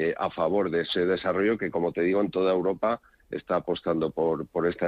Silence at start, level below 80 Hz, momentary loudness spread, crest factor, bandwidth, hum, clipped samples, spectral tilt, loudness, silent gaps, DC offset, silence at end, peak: 0 s; -60 dBFS; 4 LU; 14 dB; 5.2 kHz; none; under 0.1%; -8 dB/octave; -27 LUFS; none; under 0.1%; 0 s; -12 dBFS